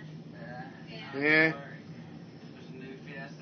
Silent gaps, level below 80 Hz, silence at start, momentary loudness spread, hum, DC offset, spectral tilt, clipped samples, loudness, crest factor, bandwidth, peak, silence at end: none; -74 dBFS; 0 s; 24 LU; none; under 0.1%; -6.5 dB/octave; under 0.1%; -26 LUFS; 22 dB; 6.6 kHz; -10 dBFS; 0 s